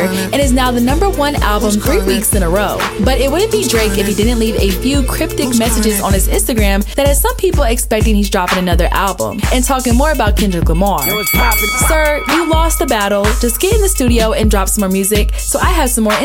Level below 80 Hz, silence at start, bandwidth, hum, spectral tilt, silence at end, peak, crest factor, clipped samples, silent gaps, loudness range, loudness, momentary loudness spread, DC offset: -18 dBFS; 0 s; 17 kHz; none; -4 dB/octave; 0 s; -2 dBFS; 10 dB; under 0.1%; none; 1 LU; -13 LUFS; 2 LU; under 0.1%